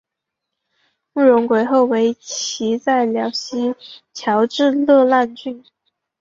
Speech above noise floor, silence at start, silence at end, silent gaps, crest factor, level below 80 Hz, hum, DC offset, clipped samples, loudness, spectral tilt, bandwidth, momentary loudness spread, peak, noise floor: 64 dB; 1.15 s; 0.6 s; none; 16 dB; -66 dBFS; none; under 0.1%; under 0.1%; -17 LUFS; -4 dB/octave; 7.6 kHz; 15 LU; -2 dBFS; -81 dBFS